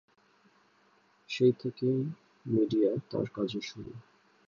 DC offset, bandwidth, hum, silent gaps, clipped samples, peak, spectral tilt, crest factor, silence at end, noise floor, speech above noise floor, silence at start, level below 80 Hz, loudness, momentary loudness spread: under 0.1%; 7.4 kHz; none; none; under 0.1%; -14 dBFS; -7.5 dB/octave; 18 dB; 0.5 s; -67 dBFS; 36 dB; 1.3 s; -70 dBFS; -31 LUFS; 19 LU